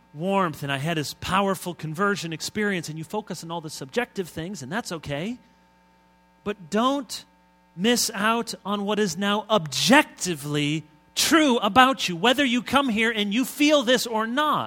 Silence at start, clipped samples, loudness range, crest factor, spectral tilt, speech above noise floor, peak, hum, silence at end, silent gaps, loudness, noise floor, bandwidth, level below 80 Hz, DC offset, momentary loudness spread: 0.15 s; under 0.1%; 10 LU; 24 dB; -3.5 dB/octave; 35 dB; 0 dBFS; none; 0 s; none; -23 LUFS; -59 dBFS; 17.5 kHz; -58 dBFS; under 0.1%; 14 LU